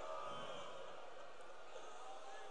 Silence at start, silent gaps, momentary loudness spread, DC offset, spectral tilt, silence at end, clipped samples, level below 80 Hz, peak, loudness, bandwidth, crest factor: 0 s; none; 8 LU; 0.3%; -3 dB/octave; 0 s; under 0.1%; -82 dBFS; -36 dBFS; -53 LUFS; 10 kHz; 16 dB